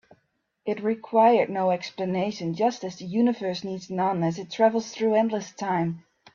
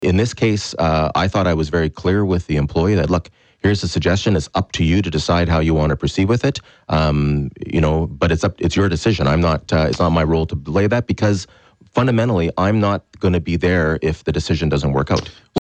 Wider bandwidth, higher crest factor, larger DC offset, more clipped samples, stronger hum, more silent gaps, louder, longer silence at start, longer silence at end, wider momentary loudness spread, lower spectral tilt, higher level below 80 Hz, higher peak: second, 7.4 kHz vs 9 kHz; first, 18 dB vs 12 dB; neither; neither; neither; neither; second, -25 LUFS vs -18 LUFS; first, 0.65 s vs 0 s; first, 0.35 s vs 0 s; first, 11 LU vs 4 LU; about the same, -6 dB/octave vs -6.5 dB/octave; second, -70 dBFS vs -32 dBFS; second, -8 dBFS vs -4 dBFS